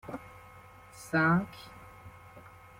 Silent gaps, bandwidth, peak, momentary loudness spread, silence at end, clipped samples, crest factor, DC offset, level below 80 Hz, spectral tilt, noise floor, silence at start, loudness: none; 16 kHz; -16 dBFS; 26 LU; 0.4 s; under 0.1%; 18 dB; under 0.1%; -62 dBFS; -6.5 dB/octave; -53 dBFS; 0.05 s; -29 LUFS